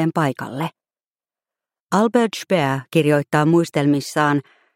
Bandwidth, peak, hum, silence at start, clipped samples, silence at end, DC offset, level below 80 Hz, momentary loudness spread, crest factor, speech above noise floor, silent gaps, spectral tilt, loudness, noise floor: 16.5 kHz; -2 dBFS; none; 0 s; under 0.1%; 0.35 s; under 0.1%; -62 dBFS; 9 LU; 16 dB; over 72 dB; 1.06-1.11 s, 1.80-1.87 s; -6 dB/octave; -19 LUFS; under -90 dBFS